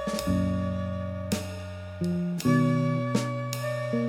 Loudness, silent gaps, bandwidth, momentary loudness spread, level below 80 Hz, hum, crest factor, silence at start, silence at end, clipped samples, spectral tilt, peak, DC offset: -28 LUFS; none; 17.5 kHz; 9 LU; -52 dBFS; none; 16 dB; 0 s; 0 s; under 0.1%; -6.5 dB/octave; -10 dBFS; under 0.1%